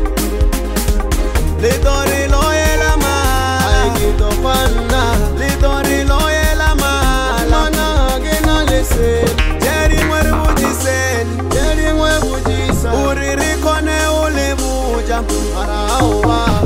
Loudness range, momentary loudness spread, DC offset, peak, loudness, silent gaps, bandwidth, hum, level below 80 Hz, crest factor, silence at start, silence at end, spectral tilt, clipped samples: 1 LU; 4 LU; under 0.1%; -2 dBFS; -15 LUFS; none; 16.5 kHz; none; -16 dBFS; 10 dB; 0 s; 0 s; -4.5 dB/octave; under 0.1%